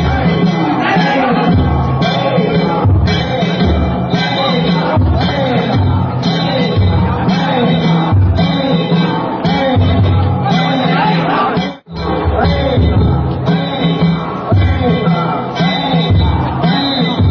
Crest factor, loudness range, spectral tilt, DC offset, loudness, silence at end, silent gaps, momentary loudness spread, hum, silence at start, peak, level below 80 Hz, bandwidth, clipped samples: 10 dB; 1 LU; -8 dB/octave; under 0.1%; -13 LUFS; 0 s; none; 3 LU; none; 0 s; -2 dBFS; -22 dBFS; 6.8 kHz; under 0.1%